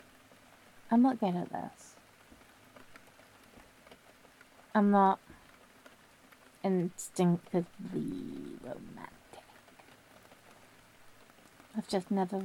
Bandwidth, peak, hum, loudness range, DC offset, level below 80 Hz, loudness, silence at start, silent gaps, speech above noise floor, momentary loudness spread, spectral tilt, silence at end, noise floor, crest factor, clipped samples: 16 kHz; -14 dBFS; none; 17 LU; under 0.1%; -72 dBFS; -32 LUFS; 0.85 s; none; 29 dB; 27 LU; -7 dB/octave; 0 s; -60 dBFS; 22 dB; under 0.1%